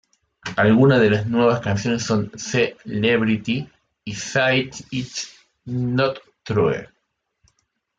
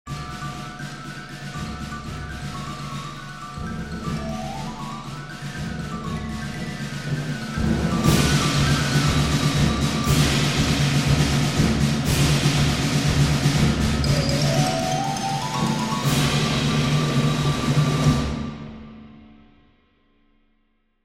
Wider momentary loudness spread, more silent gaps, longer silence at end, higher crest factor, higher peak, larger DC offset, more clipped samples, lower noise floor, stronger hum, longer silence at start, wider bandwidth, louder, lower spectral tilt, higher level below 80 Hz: about the same, 15 LU vs 14 LU; neither; second, 1.15 s vs 1.8 s; about the same, 16 dB vs 20 dB; about the same, -4 dBFS vs -4 dBFS; neither; neither; first, -73 dBFS vs -66 dBFS; neither; first, 0.45 s vs 0.05 s; second, 9 kHz vs 16 kHz; about the same, -20 LUFS vs -22 LUFS; about the same, -5.5 dB/octave vs -5 dB/octave; second, -54 dBFS vs -34 dBFS